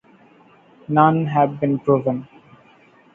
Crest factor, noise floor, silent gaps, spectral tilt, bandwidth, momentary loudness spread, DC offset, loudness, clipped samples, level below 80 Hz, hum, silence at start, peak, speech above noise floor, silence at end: 20 dB; -52 dBFS; none; -10.5 dB/octave; 3.7 kHz; 8 LU; under 0.1%; -19 LUFS; under 0.1%; -62 dBFS; none; 0.9 s; -2 dBFS; 34 dB; 0.9 s